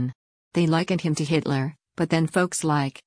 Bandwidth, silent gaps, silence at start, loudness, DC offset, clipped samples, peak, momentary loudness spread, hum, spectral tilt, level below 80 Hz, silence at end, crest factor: 10.5 kHz; 0.15-0.51 s; 0 s; -24 LUFS; under 0.1%; under 0.1%; -10 dBFS; 8 LU; none; -5.5 dB/octave; -60 dBFS; 0.15 s; 14 dB